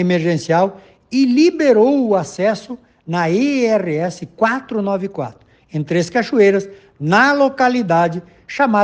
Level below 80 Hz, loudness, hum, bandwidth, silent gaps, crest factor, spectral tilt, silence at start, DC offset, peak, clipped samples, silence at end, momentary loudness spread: -60 dBFS; -16 LUFS; none; 9.4 kHz; none; 16 dB; -6 dB/octave; 0 s; under 0.1%; 0 dBFS; under 0.1%; 0 s; 13 LU